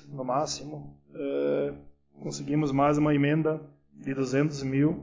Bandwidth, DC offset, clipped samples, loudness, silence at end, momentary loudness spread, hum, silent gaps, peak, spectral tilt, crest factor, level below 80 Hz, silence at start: 7.6 kHz; under 0.1%; under 0.1%; -28 LUFS; 0 s; 17 LU; none; none; -12 dBFS; -6.5 dB/octave; 16 dB; -58 dBFS; 0.05 s